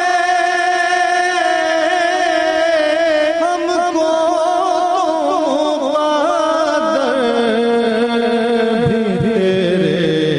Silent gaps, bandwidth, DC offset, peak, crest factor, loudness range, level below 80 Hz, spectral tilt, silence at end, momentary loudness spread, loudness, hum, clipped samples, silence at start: none; 11.5 kHz; under 0.1%; -4 dBFS; 10 dB; 1 LU; -52 dBFS; -5 dB/octave; 0 s; 2 LU; -15 LUFS; none; under 0.1%; 0 s